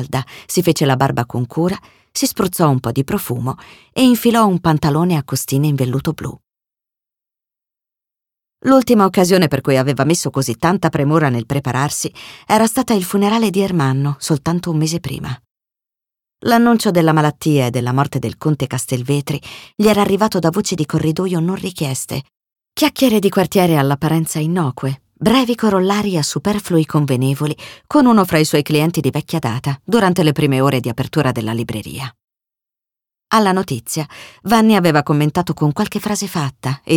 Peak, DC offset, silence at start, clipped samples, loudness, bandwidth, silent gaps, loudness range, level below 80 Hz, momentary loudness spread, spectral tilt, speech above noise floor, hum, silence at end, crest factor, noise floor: -2 dBFS; under 0.1%; 0 s; under 0.1%; -16 LUFS; 18.5 kHz; 32.24-32.28 s; 4 LU; -48 dBFS; 11 LU; -5.5 dB/octave; 72 dB; none; 0 s; 16 dB; -87 dBFS